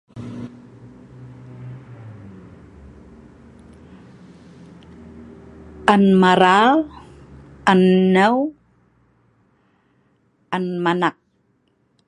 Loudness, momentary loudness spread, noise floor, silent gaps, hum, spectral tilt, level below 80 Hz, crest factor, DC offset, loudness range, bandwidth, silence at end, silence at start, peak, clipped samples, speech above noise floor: -16 LUFS; 27 LU; -64 dBFS; none; none; -6.5 dB/octave; -52 dBFS; 22 dB; under 0.1%; 11 LU; 10 kHz; 0.95 s; 0.15 s; 0 dBFS; under 0.1%; 49 dB